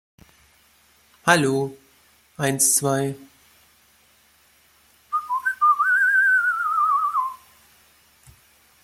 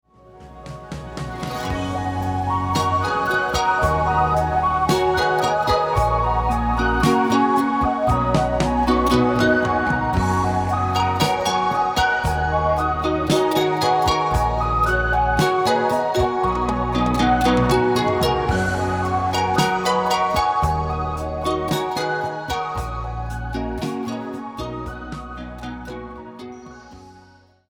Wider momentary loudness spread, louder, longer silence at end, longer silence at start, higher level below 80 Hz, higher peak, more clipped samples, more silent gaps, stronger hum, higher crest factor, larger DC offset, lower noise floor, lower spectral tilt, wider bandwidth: about the same, 12 LU vs 13 LU; about the same, -20 LUFS vs -20 LUFS; first, 1.5 s vs 0.5 s; first, 1.25 s vs 0.35 s; second, -64 dBFS vs -32 dBFS; about the same, -2 dBFS vs -4 dBFS; neither; neither; neither; first, 22 dB vs 16 dB; neither; first, -58 dBFS vs -51 dBFS; second, -3 dB/octave vs -5.5 dB/octave; second, 16.5 kHz vs 20 kHz